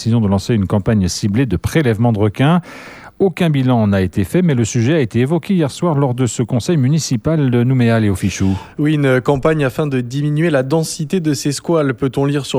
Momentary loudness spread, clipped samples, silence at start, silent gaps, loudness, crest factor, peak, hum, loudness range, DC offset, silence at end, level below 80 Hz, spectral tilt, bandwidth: 5 LU; under 0.1%; 0 s; none; -16 LUFS; 14 dB; 0 dBFS; none; 1 LU; under 0.1%; 0 s; -42 dBFS; -6.5 dB/octave; 15 kHz